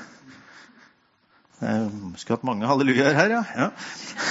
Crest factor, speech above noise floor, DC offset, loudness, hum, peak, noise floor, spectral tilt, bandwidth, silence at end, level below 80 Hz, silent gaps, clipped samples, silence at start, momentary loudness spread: 24 dB; 39 dB; under 0.1%; -23 LUFS; none; -2 dBFS; -62 dBFS; -5 dB/octave; 8 kHz; 0 s; -64 dBFS; none; under 0.1%; 0 s; 15 LU